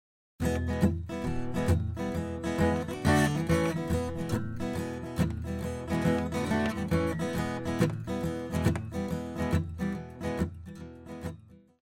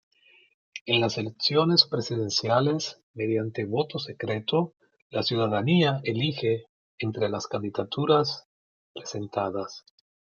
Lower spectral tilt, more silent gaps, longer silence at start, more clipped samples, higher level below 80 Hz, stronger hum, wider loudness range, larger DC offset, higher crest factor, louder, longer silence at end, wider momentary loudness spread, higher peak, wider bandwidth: first, -6.5 dB/octave vs -5 dB/octave; second, none vs 0.81-0.86 s, 3.03-3.14 s, 5.02-5.10 s, 6.69-6.98 s, 8.45-8.95 s; second, 0.4 s vs 0.75 s; neither; first, -44 dBFS vs -70 dBFS; neither; about the same, 4 LU vs 4 LU; neither; about the same, 18 dB vs 22 dB; second, -31 LUFS vs -26 LUFS; second, 0.25 s vs 0.6 s; second, 8 LU vs 13 LU; second, -12 dBFS vs -4 dBFS; first, 16 kHz vs 7.2 kHz